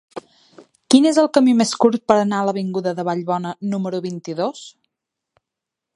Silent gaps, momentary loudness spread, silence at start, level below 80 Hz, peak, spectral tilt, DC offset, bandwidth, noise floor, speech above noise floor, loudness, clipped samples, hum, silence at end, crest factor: none; 12 LU; 0.15 s; -68 dBFS; 0 dBFS; -5 dB/octave; under 0.1%; 11.5 kHz; -84 dBFS; 66 dB; -18 LUFS; under 0.1%; none; 1.25 s; 20 dB